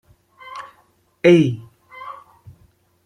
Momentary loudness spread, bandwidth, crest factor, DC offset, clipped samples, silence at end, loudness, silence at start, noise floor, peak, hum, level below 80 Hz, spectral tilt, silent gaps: 24 LU; 10 kHz; 20 dB; under 0.1%; under 0.1%; 0.95 s; -16 LUFS; 0.5 s; -59 dBFS; -2 dBFS; none; -62 dBFS; -7.5 dB/octave; none